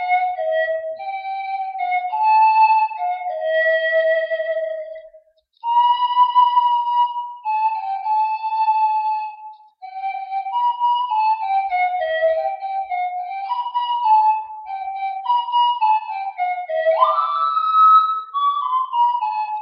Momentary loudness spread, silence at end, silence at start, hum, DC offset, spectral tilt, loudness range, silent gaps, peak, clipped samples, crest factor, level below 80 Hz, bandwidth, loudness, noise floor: 12 LU; 0 s; 0 s; none; under 0.1%; -2 dB/octave; 4 LU; none; -2 dBFS; under 0.1%; 16 dB; -74 dBFS; 5.4 kHz; -19 LUFS; -52 dBFS